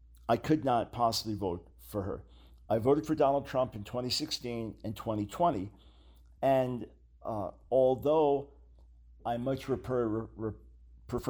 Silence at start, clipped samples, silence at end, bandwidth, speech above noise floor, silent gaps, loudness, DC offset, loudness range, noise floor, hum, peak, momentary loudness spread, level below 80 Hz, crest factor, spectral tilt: 0.25 s; under 0.1%; 0 s; over 20 kHz; 26 dB; none; -32 LUFS; under 0.1%; 3 LU; -57 dBFS; none; -14 dBFS; 13 LU; -56 dBFS; 18 dB; -6 dB/octave